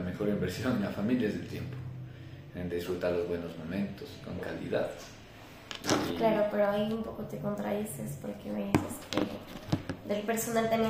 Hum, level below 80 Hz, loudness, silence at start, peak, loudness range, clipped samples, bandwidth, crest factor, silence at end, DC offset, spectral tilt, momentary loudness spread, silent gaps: none; -58 dBFS; -33 LUFS; 0 s; -8 dBFS; 4 LU; under 0.1%; 16 kHz; 24 dB; 0 s; under 0.1%; -5.5 dB/octave; 15 LU; none